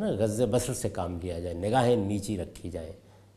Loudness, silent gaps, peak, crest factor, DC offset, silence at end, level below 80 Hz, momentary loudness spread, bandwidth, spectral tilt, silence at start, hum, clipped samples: -29 LUFS; none; -10 dBFS; 20 dB; under 0.1%; 0.35 s; -52 dBFS; 14 LU; 15 kHz; -6 dB/octave; 0 s; none; under 0.1%